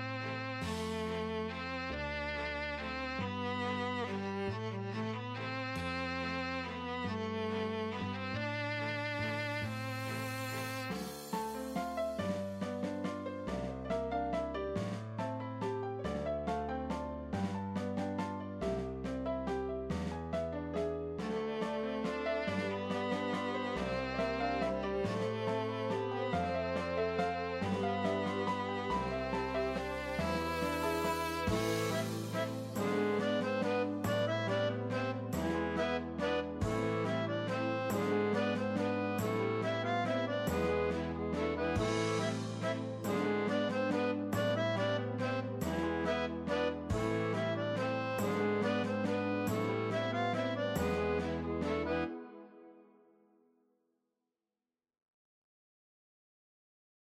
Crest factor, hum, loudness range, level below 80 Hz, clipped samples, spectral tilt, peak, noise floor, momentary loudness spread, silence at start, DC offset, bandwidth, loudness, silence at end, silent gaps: 16 dB; none; 4 LU; -56 dBFS; under 0.1%; -6 dB/octave; -20 dBFS; under -90 dBFS; 5 LU; 0 s; under 0.1%; 16 kHz; -36 LUFS; 4.35 s; none